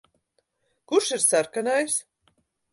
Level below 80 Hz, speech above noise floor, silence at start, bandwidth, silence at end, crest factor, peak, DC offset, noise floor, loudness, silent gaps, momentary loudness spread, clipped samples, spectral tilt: -76 dBFS; 49 dB; 0.9 s; 12 kHz; 0.7 s; 20 dB; -8 dBFS; under 0.1%; -73 dBFS; -23 LUFS; none; 6 LU; under 0.1%; -1.5 dB/octave